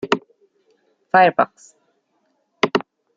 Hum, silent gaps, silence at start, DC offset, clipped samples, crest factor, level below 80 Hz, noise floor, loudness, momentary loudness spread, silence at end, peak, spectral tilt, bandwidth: none; none; 0.05 s; under 0.1%; under 0.1%; 22 dB; -68 dBFS; -68 dBFS; -19 LUFS; 9 LU; 0.35 s; 0 dBFS; -5 dB/octave; 7.8 kHz